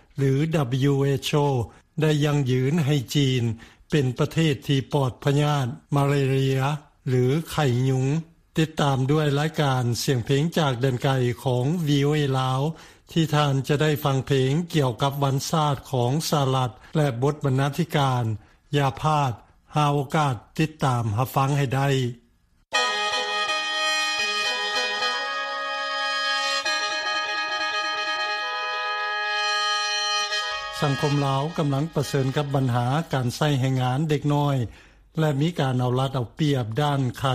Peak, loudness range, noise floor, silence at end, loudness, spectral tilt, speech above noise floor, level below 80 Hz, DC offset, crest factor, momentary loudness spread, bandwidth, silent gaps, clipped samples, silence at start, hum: -8 dBFS; 1 LU; -62 dBFS; 0 s; -24 LUFS; -5.5 dB/octave; 39 dB; -54 dBFS; under 0.1%; 16 dB; 5 LU; 15.5 kHz; none; under 0.1%; 0.15 s; none